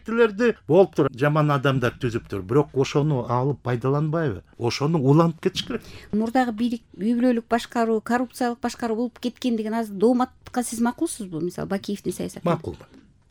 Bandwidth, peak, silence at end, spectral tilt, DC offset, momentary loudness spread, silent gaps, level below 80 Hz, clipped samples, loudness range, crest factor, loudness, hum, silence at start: 18.5 kHz; -4 dBFS; 0.45 s; -6.5 dB/octave; under 0.1%; 10 LU; none; -54 dBFS; under 0.1%; 4 LU; 20 dB; -23 LUFS; none; 0.05 s